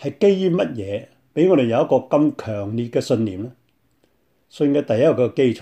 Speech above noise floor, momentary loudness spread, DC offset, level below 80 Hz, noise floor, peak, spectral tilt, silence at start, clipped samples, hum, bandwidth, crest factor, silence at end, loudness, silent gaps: 45 dB; 12 LU; under 0.1%; -64 dBFS; -64 dBFS; -4 dBFS; -7.5 dB/octave; 0 s; under 0.1%; none; 10.5 kHz; 16 dB; 0 s; -19 LUFS; none